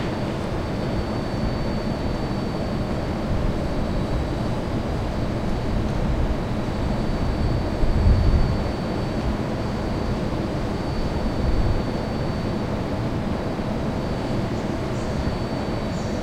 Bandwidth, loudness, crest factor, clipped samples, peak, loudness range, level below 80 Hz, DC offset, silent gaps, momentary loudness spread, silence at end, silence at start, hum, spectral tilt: 13.5 kHz; -25 LUFS; 16 dB; under 0.1%; -6 dBFS; 2 LU; -28 dBFS; under 0.1%; none; 3 LU; 0 s; 0 s; none; -7.5 dB/octave